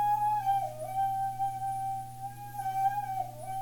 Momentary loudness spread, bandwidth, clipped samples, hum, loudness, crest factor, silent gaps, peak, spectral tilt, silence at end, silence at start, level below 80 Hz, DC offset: 10 LU; 17.5 kHz; under 0.1%; 60 Hz at -50 dBFS; -33 LUFS; 12 dB; none; -20 dBFS; -4.5 dB/octave; 0 s; 0 s; -60 dBFS; under 0.1%